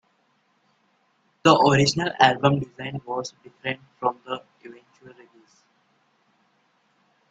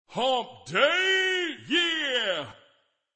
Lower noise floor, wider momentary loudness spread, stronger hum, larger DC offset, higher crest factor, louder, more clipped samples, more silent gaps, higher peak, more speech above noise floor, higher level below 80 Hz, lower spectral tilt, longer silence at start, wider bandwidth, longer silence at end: about the same, -67 dBFS vs -66 dBFS; first, 17 LU vs 8 LU; neither; neither; first, 26 dB vs 18 dB; first, -22 LUFS vs -25 LUFS; neither; neither; first, 0 dBFS vs -8 dBFS; first, 45 dB vs 41 dB; first, -60 dBFS vs -72 dBFS; first, -5 dB/octave vs -2.5 dB/octave; first, 1.45 s vs 0.1 s; about the same, 9.2 kHz vs 8.8 kHz; first, 2.2 s vs 0.65 s